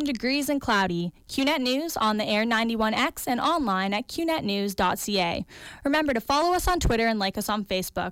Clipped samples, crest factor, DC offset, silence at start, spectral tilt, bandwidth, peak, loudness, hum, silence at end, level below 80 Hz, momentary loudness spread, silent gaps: under 0.1%; 14 dB; under 0.1%; 0 s; -4 dB/octave; 17 kHz; -12 dBFS; -25 LUFS; none; 0 s; -42 dBFS; 5 LU; none